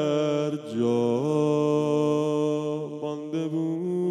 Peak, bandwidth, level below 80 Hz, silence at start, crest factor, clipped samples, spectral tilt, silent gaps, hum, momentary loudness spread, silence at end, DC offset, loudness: -12 dBFS; 11.5 kHz; under -90 dBFS; 0 s; 12 dB; under 0.1%; -7.5 dB/octave; none; none; 7 LU; 0 s; under 0.1%; -26 LUFS